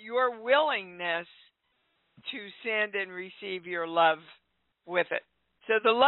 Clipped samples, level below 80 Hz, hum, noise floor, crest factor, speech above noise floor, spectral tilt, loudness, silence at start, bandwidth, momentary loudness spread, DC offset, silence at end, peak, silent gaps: under 0.1%; -76 dBFS; none; -75 dBFS; 20 dB; 47 dB; 0 dB/octave; -29 LUFS; 0 s; 4.2 kHz; 14 LU; under 0.1%; 0 s; -10 dBFS; none